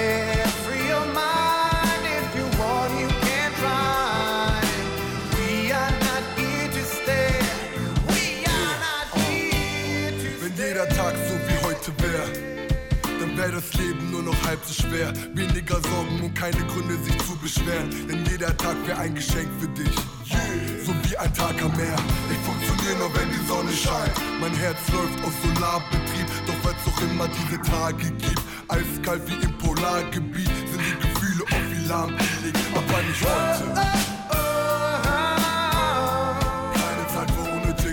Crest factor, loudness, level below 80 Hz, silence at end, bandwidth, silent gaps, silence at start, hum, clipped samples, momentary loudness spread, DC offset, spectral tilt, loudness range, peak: 14 dB; -24 LUFS; -34 dBFS; 0 s; 18 kHz; none; 0 s; none; under 0.1%; 5 LU; under 0.1%; -4.5 dB/octave; 3 LU; -10 dBFS